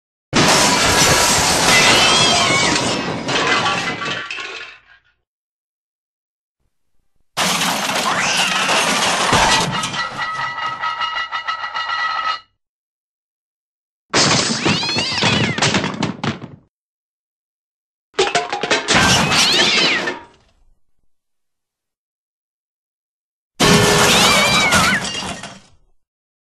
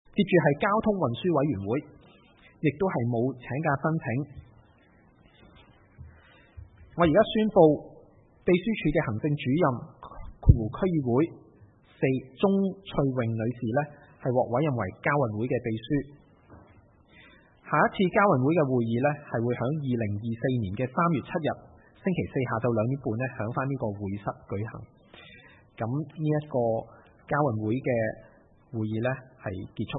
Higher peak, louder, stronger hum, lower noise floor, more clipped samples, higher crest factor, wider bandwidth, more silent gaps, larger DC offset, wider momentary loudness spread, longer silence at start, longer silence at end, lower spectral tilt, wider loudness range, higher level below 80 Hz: first, 0 dBFS vs -4 dBFS; first, -15 LUFS vs -27 LUFS; neither; first, -79 dBFS vs -59 dBFS; neither; second, 18 dB vs 24 dB; first, 13 kHz vs 4 kHz; first, 5.27-6.55 s, 12.68-14.09 s, 16.69-18.13 s, 21.97-23.51 s vs none; neither; about the same, 12 LU vs 12 LU; first, 0.3 s vs 0.15 s; first, 0.9 s vs 0 s; second, -2 dB/octave vs -11.5 dB/octave; first, 10 LU vs 6 LU; about the same, -42 dBFS vs -46 dBFS